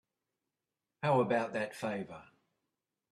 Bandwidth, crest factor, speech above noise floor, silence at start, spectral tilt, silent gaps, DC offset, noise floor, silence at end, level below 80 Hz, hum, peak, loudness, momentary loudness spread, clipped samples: 13 kHz; 20 dB; 56 dB; 1 s; -6.5 dB/octave; none; under 0.1%; -90 dBFS; 0.9 s; -78 dBFS; none; -18 dBFS; -34 LUFS; 16 LU; under 0.1%